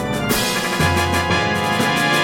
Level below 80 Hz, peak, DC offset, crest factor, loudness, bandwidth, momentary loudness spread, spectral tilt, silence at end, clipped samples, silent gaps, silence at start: -38 dBFS; -2 dBFS; under 0.1%; 16 dB; -17 LUFS; 17 kHz; 2 LU; -4 dB/octave; 0 s; under 0.1%; none; 0 s